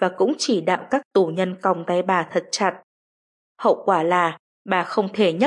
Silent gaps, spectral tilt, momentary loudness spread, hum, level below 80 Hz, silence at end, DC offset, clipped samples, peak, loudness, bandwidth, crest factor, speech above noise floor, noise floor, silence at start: 1.05-1.11 s, 2.83-3.55 s, 4.39-4.65 s; -4.5 dB/octave; 5 LU; none; -76 dBFS; 0 s; under 0.1%; under 0.1%; -4 dBFS; -21 LUFS; 11 kHz; 16 dB; over 69 dB; under -90 dBFS; 0 s